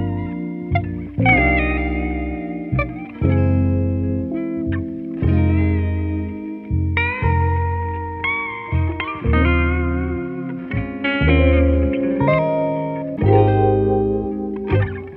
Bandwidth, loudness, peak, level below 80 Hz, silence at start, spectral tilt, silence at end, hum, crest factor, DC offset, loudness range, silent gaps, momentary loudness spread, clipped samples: 4.3 kHz; -19 LUFS; -2 dBFS; -26 dBFS; 0 s; -11 dB/octave; 0 s; none; 16 dB; under 0.1%; 4 LU; none; 10 LU; under 0.1%